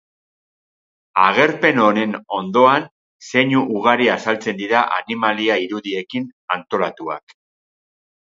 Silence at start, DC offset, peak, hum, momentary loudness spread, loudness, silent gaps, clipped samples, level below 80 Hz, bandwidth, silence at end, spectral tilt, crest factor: 1.15 s; under 0.1%; 0 dBFS; none; 11 LU; -18 LUFS; 2.91-3.19 s, 6.33-6.48 s; under 0.1%; -68 dBFS; 7.8 kHz; 1.1 s; -5.5 dB/octave; 18 dB